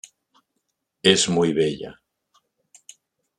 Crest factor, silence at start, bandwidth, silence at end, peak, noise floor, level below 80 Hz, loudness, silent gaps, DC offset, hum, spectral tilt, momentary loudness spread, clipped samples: 24 dB; 1.05 s; 11.5 kHz; 1.45 s; 0 dBFS; -77 dBFS; -62 dBFS; -20 LUFS; none; under 0.1%; none; -3.5 dB/octave; 17 LU; under 0.1%